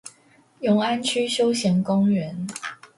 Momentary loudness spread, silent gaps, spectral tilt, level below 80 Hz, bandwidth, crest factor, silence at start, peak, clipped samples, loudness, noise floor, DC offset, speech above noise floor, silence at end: 11 LU; none; -5 dB/octave; -66 dBFS; 11.5 kHz; 14 dB; 0.05 s; -10 dBFS; under 0.1%; -22 LUFS; -57 dBFS; under 0.1%; 35 dB; 0.1 s